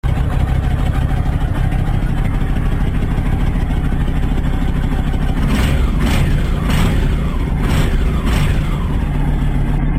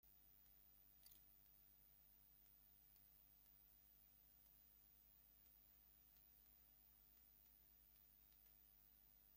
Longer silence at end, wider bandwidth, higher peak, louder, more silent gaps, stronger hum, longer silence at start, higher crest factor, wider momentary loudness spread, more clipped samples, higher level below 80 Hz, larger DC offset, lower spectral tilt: about the same, 0 s vs 0 s; about the same, 15 kHz vs 16.5 kHz; first, -4 dBFS vs -52 dBFS; first, -18 LUFS vs -69 LUFS; neither; neither; about the same, 0.05 s vs 0 s; second, 10 dB vs 20 dB; about the same, 3 LU vs 1 LU; neither; first, -16 dBFS vs -82 dBFS; first, 0.4% vs under 0.1%; first, -7 dB/octave vs -3 dB/octave